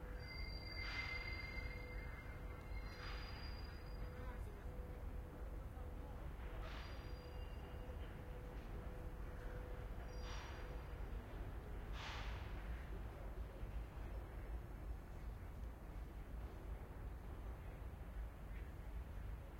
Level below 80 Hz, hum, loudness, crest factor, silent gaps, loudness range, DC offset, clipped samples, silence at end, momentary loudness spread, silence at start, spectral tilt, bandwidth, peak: -50 dBFS; none; -52 LUFS; 16 dB; none; 4 LU; under 0.1%; under 0.1%; 0 s; 5 LU; 0 s; -6 dB/octave; 16 kHz; -34 dBFS